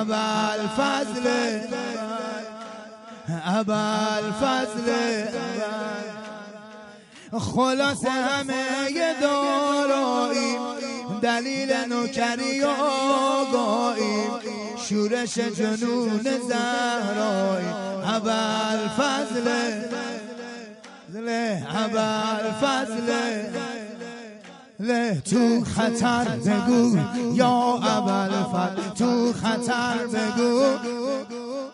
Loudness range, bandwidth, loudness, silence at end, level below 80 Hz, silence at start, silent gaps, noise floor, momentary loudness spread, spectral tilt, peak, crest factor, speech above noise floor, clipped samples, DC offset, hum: 5 LU; 11.5 kHz; -24 LUFS; 0 s; -62 dBFS; 0 s; none; -45 dBFS; 12 LU; -4.5 dB/octave; -6 dBFS; 18 dB; 22 dB; under 0.1%; under 0.1%; none